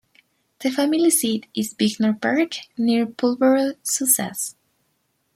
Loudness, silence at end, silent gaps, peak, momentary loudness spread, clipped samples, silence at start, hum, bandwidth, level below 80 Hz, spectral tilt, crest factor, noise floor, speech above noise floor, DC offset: -21 LUFS; 0.85 s; none; -4 dBFS; 9 LU; under 0.1%; 0.6 s; none; 16.5 kHz; -68 dBFS; -3 dB/octave; 18 dB; -69 dBFS; 49 dB; under 0.1%